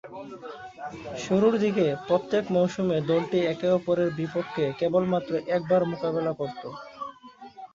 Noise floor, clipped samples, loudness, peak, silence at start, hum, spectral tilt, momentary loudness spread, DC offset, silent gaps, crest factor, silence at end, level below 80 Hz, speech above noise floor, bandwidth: -47 dBFS; under 0.1%; -26 LUFS; -10 dBFS; 0.05 s; none; -7 dB/octave; 16 LU; under 0.1%; none; 18 dB; 0.1 s; -64 dBFS; 21 dB; 7.6 kHz